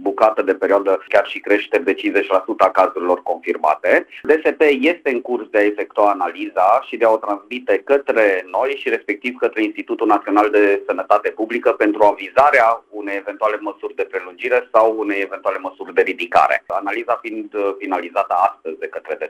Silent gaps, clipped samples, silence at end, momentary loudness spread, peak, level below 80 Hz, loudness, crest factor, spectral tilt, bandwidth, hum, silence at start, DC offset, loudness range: none; under 0.1%; 0 s; 9 LU; 0 dBFS; -60 dBFS; -18 LUFS; 16 dB; -4.5 dB/octave; 14 kHz; none; 0 s; under 0.1%; 3 LU